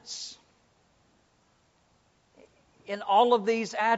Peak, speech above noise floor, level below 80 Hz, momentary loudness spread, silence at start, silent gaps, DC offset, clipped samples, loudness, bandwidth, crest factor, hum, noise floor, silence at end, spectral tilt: -10 dBFS; 42 dB; -76 dBFS; 16 LU; 0.05 s; none; under 0.1%; under 0.1%; -26 LUFS; 8 kHz; 20 dB; none; -67 dBFS; 0 s; -1.5 dB/octave